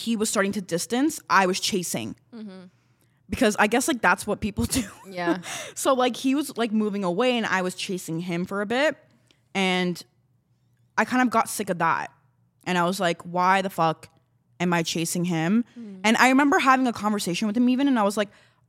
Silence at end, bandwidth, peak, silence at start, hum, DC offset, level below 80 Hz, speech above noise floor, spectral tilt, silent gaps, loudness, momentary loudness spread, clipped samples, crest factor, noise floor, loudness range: 0.4 s; 16.5 kHz; -4 dBFS; 0 s; none; under 0.1%; -54 dBFS; 42 dB; -4 dB/octave; none; -24 LUFS; 11 LU; under 0.1%; 20 dB; -66 dBFS; 4 LU